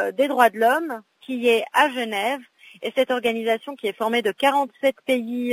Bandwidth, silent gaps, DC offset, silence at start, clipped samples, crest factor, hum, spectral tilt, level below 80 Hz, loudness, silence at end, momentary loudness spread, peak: 16 kHz; none; under 0.1%; 0 s; under 0.1%; 20 dB; none; -3 dB/octave; -74 dBFS; -22 LUFS; 0 s; 11 LU; -2 dBFS